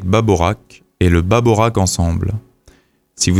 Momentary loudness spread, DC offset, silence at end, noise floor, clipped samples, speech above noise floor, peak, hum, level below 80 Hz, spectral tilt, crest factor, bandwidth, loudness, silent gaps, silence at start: 10 LU; under 0.1%; 0 s; -51 dBFS; under 0.1%; 37 dB; 0 dBFS; none; -30 dBFS; -5.5 dB/octave; 16 dB; 15 kHz; -15 LUFS; none; 0 s